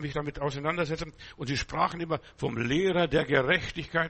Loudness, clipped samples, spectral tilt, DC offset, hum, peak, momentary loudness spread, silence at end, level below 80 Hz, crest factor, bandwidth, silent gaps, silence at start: -29 LUFS; under 0.1%; -5.5 dB/octave; under 0.1%; none; -10 dBFS; 9 LU; 0 s; -48 dBFS; 18 dB; 8.4 kHz; none; 0 s